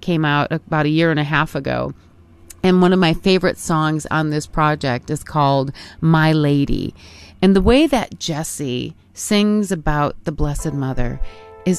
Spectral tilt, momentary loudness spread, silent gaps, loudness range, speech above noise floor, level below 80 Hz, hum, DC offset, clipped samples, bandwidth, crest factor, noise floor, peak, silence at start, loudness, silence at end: -6 dB/octave; 11 LU; none; 3 LU; 26 dB; -32 dBFS; none; under 0.1%; under 0.1%; 13.5 kHz; 16 dB; -44 dBFS; -2 dBFS; 0 s; -18 LUFS; 0 s